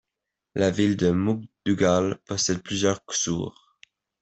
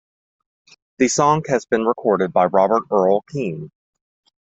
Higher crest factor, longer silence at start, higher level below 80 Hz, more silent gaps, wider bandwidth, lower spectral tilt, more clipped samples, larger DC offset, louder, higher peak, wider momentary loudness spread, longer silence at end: about the same, 18 dB vs 18 dB; second, 0.55 s vs 1 s; about the same, -58 dBFS vs -62 dBFS; neither; about the same, 8.4 kHz vs 8.2 kHz; about the same, -4.5 dB/octave vs -5 dB/octave; neither; neither; second, -24 LUFS vs -18 LUFS; second, -8 dBFS vs -2 dBFS; second, 7 LU vs 10 LU; second, 0.7 s vs 0.9 s